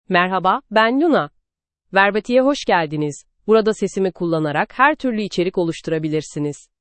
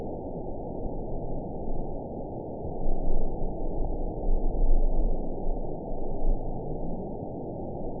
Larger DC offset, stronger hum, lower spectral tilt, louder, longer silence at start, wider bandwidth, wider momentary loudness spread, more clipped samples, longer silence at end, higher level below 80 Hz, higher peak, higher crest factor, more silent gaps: second, under 0.1% vs 0.4%; neither; second, -5.5 dB/octave vs -17 dB/octave; first, -18 LUFS vs -35 LUFS; about the same, 0.1 s vs 0 s; first, 8.8 kHz vs 1 kHz; first, 9 LU vs 6 LU; neither; first, 0.25 s vs 0 s; second, -54 dBFS vs -28 dBFS; first, 0 dBFS vs -10 dBFS; about the same, 18 dB vs 16 dB; neither